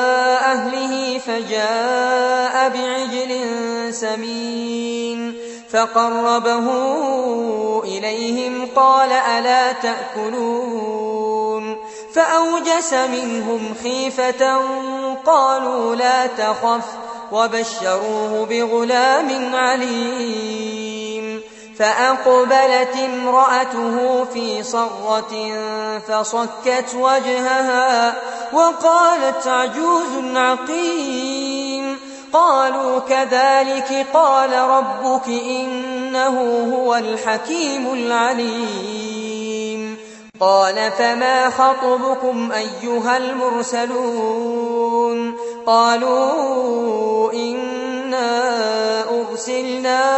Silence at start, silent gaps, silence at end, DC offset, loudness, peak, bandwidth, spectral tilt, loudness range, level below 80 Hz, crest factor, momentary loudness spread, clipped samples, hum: 0 s; none; 0 s; under 0.1%; -18 LUFS; -2 dBFS; 8.4 kHz; -2.5 dB/octave; 4 LU; -68 dBFS; 16 dB; 10 LU; under 0.1%; none